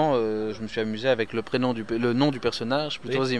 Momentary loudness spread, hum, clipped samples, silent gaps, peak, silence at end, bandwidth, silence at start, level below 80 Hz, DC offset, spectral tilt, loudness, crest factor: 6 LU; none; under 0.1%; none; -10 dBFS; 0 s; 11 kHz; 0 s; -56 dBFS; 0.6%; -6 dB/octave; -26 LUFS; 16 dB